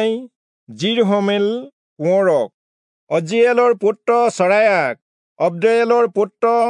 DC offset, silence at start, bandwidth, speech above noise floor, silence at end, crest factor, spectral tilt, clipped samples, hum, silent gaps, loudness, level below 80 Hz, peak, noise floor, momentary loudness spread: under 0.1%; 0 s; 10.5 kHz; over 74 dB; 0 s; 14 dB; -5.5 dB/octave; under 0.1%; none; 0.36-0.67 s, 1.73-1.96 s, 2.54-3.07 s, 5.02-5.36 s; -16 LUFS; -78 dBFS; -2 dBFS; under -90 dBFS; 9 LU